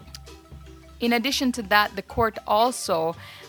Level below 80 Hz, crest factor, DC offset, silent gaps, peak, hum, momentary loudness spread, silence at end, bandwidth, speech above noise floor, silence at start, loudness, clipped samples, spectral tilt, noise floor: -48 dBFS; 24 dB; under 0.1%; none; -2 dBFS; none; 9 LU; 0 s; 19.5 kHz; 21 dB; 0 s; -23 LUFS; under 0.1%; -3.5 dB/octave; -44 dBFS